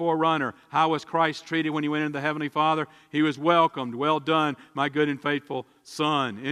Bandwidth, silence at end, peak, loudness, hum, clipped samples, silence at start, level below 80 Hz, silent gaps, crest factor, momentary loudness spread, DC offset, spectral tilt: 12 kHz; 0 s; -6 dBFS; -25 LUFS; none; under 0.1%; 0 s; -74 dBFS; none; 20 dB; 7 LU; under 0.1%; -5.5 dB/octave